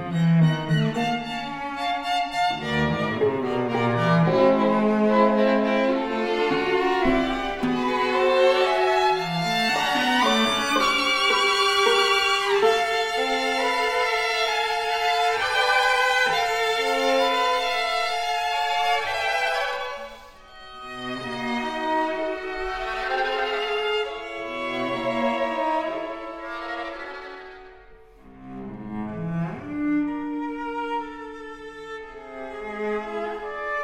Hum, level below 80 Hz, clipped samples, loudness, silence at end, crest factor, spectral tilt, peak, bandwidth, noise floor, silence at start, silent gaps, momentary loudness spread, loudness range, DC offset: none; -50 dBFS; under 0.1%; -23 LUFS; 0 s; 16 dB; -4.5 dB/octave; -6 dBFS; 16.5 kHz; -48 dBFS; 0 s; none; 15 LU; 10 LU; under 0.1%